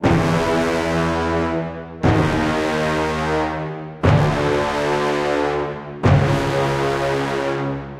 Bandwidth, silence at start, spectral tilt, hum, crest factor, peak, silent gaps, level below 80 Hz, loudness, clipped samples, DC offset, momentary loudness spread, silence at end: 14 kHz; 0 s; -6.5 dB/octave; none; 18 dB; -2 dBFS; none; -36 dBFS; -19 LUFS; under 0.1%; under 0.1%; 7 LU; 0 s